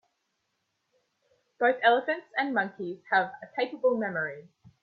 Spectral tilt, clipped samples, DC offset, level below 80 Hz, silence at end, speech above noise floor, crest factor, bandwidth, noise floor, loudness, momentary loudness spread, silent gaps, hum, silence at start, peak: -7 dB/octave; under 0.1%; under 0.1%; -80 dBFS; 0.4 s; 51 dB; 22 dB; 4.9 kHz; -79 dBFS; -28 LUFS; 11 LU; none; none; 1.6 s; -8 dBFS